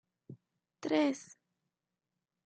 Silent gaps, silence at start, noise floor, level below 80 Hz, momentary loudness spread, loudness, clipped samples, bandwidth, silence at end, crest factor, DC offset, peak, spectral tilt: none; 0.3 s; -89 dBFS; -88 dBFS; 25 LU; -34 LUFS; under 0.1%; 9 kHz; 1.25 s; 22 dB; under 0.1%; -18 dBFS; -4.5 dB/octave